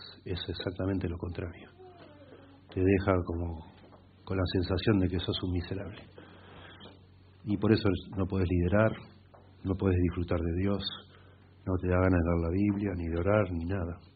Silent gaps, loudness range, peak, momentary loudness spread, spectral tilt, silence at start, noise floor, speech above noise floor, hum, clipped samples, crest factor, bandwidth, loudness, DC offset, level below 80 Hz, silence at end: none; 3 LU; -10 dBFS; 18 LU; -6.5 dB/octave; 0 s; -56 dBFS; 27 dB; none; under 0.1%; 20 dB; 4.8 kHz; -31 LUFS; under 0.1%; -52 dBFS; 0.15 s